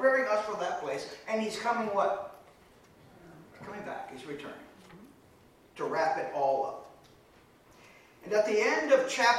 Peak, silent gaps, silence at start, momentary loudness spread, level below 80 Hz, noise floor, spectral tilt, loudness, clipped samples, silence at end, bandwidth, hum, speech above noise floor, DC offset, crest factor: -12 dBFS; none; 0 s; 20 LU; -72 dBFS; -60 dBFS; -3 dB/octave; -31 LUFS; under 0.1%; 0 s; 15 kHz; none; 30 dB; under 0.1%; 20 dB